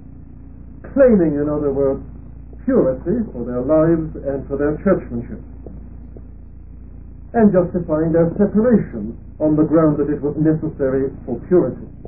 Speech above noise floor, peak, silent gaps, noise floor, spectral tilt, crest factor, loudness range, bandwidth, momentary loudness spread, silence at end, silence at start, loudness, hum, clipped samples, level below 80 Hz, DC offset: 21 dB; -2 dBFS; none; -38 dBFS; -16 dB/octave; 16 dB; 5 LU; 2.7 kHz; 22 LU; 0 s; 0 s; -18 LUFS; none; under 0.1%; -36 dBFS; 0.8%